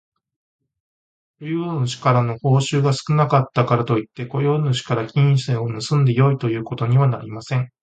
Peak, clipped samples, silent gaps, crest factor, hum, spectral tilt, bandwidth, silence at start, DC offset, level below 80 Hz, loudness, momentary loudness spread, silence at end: -2 dBFS; under 0.1%; none; 18 dB; none; -7 dB/octave; 9 kHz; 1.4 s; under 0.1%; -56 dBFS; -19 LUFS; 7 LU; 0.15 s